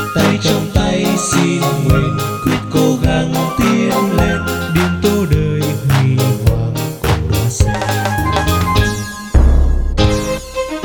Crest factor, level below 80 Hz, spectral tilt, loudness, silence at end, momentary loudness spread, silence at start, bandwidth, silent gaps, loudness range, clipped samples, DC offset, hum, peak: 14 dB; -20 dBFS; -5.5 dB/octave; -15 LUFS; 0 s; 4 LU; 0 s; 19 kHz; none; 1 LU; under 0.1%; under 0.1%; none; 0 dBFS